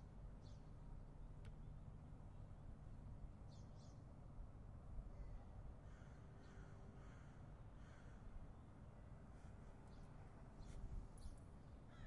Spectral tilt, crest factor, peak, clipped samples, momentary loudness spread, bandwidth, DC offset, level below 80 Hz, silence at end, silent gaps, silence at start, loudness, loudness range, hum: -7 dB/octave; 18 dB; -40 dBFS; under 0.1%; 3 LU; 10.5 kHz; under 0.1%; -60 dBFS; 0 s; none; 0 s; -61 LUFS; 2 LU; none